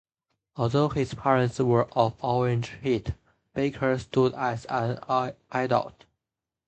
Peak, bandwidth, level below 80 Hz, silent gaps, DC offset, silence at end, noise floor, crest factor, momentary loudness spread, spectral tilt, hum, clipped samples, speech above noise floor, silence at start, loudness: -6 dBFS; 8.6 kHz; -52 dBFS; none; under 0.1%; 0.75 s; -88 dBFS; 20 dB; 7 LU; -7 dB/octave; none; under 0.1%; 63 dB; 0.55 s; -26 LUFS